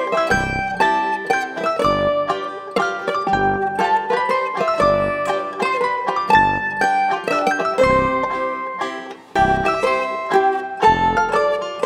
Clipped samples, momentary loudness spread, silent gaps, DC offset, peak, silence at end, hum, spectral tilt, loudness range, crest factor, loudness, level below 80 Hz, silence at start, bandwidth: under 0.1%; 7 LU; none; under 0.1%; -2 dBFS; 0 s; none; -5 dB/octave; 2 LU; 16 dB; -18 LUFS; -42 dBFS; 0 s; 15 kHz